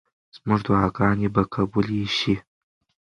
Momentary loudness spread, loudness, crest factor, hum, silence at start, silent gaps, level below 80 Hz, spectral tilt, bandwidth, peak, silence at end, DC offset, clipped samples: 5 LU; -23 LUFS; 20 dB; none; 0.35 s; none; -46 dBFS; -7 dB/octave; 9.8 kHz; -4 dBFS; 0.65 s; under 0.1%; under 0.1%